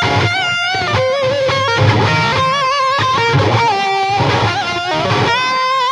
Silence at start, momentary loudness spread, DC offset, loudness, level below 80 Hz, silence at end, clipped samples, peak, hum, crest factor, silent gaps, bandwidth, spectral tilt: 0 s; 3 LU; under 0.1%; -14 LUFS; -42 dBFS; 0 s; under 0.1%; 0 dBFS; none; 14 dB; none; 10.5 kHz; -4.5 dB/octave